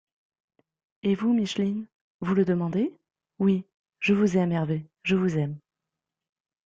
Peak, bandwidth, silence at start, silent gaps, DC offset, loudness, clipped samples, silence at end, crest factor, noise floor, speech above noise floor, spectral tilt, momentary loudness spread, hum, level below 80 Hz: -10 dBFS; 7.6 kHz; 1.05 s; 1.95-2.19 s, 3.74-3.84 s; under 0.1%; -26 LUFS; under 0.1%; 1.05 s; 16 dB; -87 dBFS; 63 dB; -7.5 dB/octave; 9 LU; none; -64 dBFS